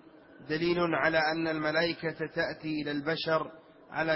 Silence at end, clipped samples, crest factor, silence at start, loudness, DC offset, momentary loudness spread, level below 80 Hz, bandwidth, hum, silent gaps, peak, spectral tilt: 0 s; under 0.1%; 20 dB; 0.4 s; -30 LUFS; under 0.1%; 8 LU; -64 dBFS; 5.8 kHz; none; none; -12 dBFS; -9 dB/octave